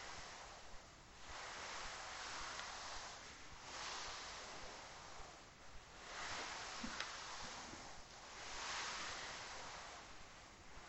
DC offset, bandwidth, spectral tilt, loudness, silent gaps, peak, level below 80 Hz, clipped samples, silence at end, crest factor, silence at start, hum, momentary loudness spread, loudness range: under 0.1%; 16 kHz; -1 dB/octave; -50 LUFS; none; -24 dBFS; -64 dBFS; under 0.1%; 0 s; 28 dB; 0 s; none; 12 LU; 3 LU